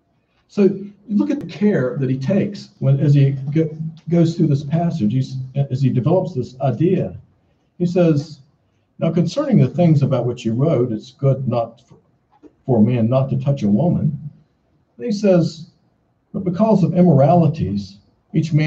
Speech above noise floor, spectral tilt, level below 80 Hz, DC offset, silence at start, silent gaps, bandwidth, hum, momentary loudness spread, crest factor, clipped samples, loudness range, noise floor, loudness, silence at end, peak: 46 dB; -9 dB/octave; -54 dBFS; under 0.1%; 0.55 s; none; 7.6 kHz; none; 11 LU; 16 dB; under 0.1%; 3 LU; -63 dBFS; -18 LUFS; 0 s; -2 dBFS